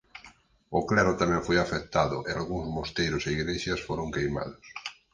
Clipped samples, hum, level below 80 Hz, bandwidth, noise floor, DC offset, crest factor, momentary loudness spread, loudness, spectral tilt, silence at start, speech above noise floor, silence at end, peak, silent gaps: under 0.1%; none; -46 dBFS; 9.8 kHz; -56 dBFS; under 0.1%; 22 dB; 14 LU; -28 LUFS; -5 dB/octave; 0.15 s; 28 dB; 0.2 s; -8 dBFS; none